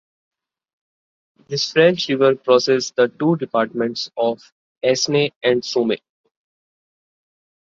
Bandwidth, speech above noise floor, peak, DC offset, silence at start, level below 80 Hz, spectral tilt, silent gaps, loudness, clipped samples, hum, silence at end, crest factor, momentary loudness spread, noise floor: 7.6 kHz; over 72 dB; -2 dBFS; under 0.1%; 1.5 s; -66 dBFS; -4.5 dB/octave; 4.52-4.81 s, 5.36-5.41 s; -19 LUFS; under 0.1%; none; 1.7 s; 18 dB; 8 LU; under -90 dBFS